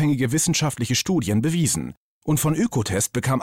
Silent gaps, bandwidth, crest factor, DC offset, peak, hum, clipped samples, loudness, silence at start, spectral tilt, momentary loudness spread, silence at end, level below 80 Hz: 1.97-2.21 s; 17 kHz; 10 dB; under 0.1%; -12 dBFS; none; under 0.1%; -22 LUFS; 0 s; -4.5 dB/octave; 5 LU; 0 s; -50 dBFS